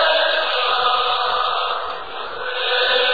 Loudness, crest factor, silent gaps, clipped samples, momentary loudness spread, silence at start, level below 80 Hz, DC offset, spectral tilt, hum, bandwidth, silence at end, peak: -19 LUFS; 14 dB; none; under 0.1%; 11 LU; 0 s; -56 dBFS; 2%; -2 dB/octave; none; 4.9 kHz; 0 s; -6 dBFS